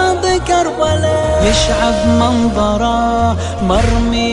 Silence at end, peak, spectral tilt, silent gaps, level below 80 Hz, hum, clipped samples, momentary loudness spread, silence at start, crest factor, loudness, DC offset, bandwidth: 0 s; 0 dBFS; -5 dB/octave; none; -22 dBFS; none; under 0.1%; 3 LU; 0 s; 12 dB; -13 LUFS; 0.7%; 11.5 kHz